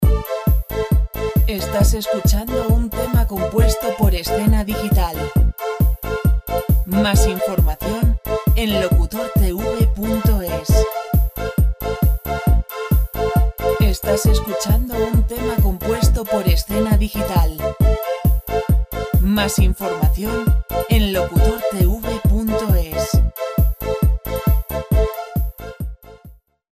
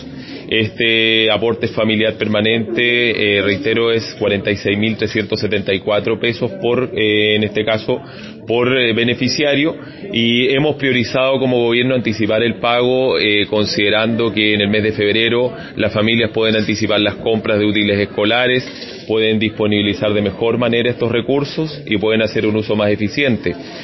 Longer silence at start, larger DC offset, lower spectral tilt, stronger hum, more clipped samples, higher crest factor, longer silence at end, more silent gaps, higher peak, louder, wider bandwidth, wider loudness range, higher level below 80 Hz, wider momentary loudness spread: about the same, 0 s vs 0 s; second, under 0.1% vs 0.1%; about the same, -6 dB/octave vs -6 dB/octave; neither; neither; about the same, 14 dB vs 16 dB; first, 0.4 s vs 0 s; neither; about the same, -2 dBFS vs 0 dBFS; second, -19 LUFS vs -15 LUFS; first, 16 kHz vs 6.2 kHz; about the same, 1 LU vs 2 LU; first, -20 dBFS vs -46 dBFS; about the same, 3 LU vs 5 LU